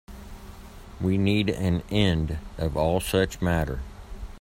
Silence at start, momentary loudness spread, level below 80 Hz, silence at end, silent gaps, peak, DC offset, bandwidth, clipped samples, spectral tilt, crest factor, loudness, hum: 0.1 s; 21 LU; -38 dBFS; 0 s; none; -8 dBFS; under 0.1%; 16 kHz; under 0.1%; -6 dB/octave; 18 dB; -25 LUFS; none